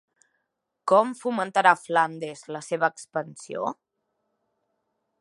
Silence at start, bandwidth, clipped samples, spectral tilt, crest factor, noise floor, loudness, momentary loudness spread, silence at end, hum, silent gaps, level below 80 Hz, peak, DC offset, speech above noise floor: 0.85 s; 11.5 kHz; under 0.1%; -4.5 dB/octave; 24 dB; -79 dBFS; -25 LUFS; 15 LU; 1.5 s; none; none; -84 dBFS; -4 dBFS; under 0.1%; 55 dB